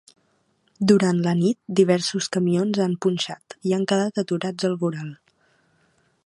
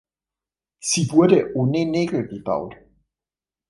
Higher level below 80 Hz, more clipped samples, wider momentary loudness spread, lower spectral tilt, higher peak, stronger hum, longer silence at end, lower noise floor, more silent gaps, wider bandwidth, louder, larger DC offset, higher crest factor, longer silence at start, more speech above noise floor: second, -66 dBFS vs -58 dBFS; neither; about the same, 9 LU vs 11 LU; about the same, -6 dB/octave vs -5.5 dB/octave; about the same, -4 dBFS vs -2 dBFS; neither; first, 1.1 s vs 0.95 s; second, -66 dBFS vs under -90 dBFS; neither; about the same, 11.5 kHz vs 11.5 kHz; about the same, -22 LUFS vs -20 LUFS; neither; about the same, 20 dB vs 20 dB; about the same, 0.8 s vs 0.85 s; second, 45 dB vs over 70 dB